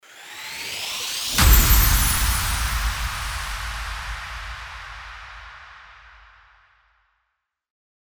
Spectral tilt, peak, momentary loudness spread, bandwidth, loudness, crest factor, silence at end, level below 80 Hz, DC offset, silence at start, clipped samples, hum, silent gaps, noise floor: -2.5 dB/octave; -2 dBFS; 23 LU; over 20 kHz; -21 LUFS; 22 dB; 2.25 s; -26 dBFS; under 0.1%; 0.1 s; under 0.1%; none; none; -77 dBFS